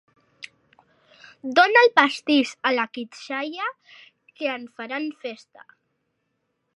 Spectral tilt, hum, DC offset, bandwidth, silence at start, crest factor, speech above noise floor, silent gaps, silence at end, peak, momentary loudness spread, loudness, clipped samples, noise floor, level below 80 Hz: -2.5 dB/octave; none; under 0.1%; 11.5 kHz; 0.4 s; 24 dB; 52 dB; none; 1.4 s; 0 dBFS; 26 LU; -21 LUFS; under 0.1%; -75 dBFS; -76 dBFS